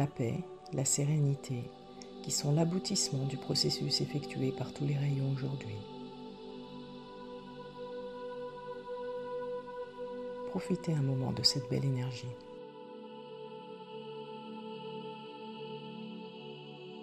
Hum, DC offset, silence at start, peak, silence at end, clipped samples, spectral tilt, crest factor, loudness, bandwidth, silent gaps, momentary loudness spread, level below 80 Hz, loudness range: none; under 0.1%; 0 s; -12 dBFS; 0 s; under 0.1%; -4.5 dB/octave; 24 dB; -35 LUFS; 14 kHz; none; 17 LU; -68 dBFS; 12 LU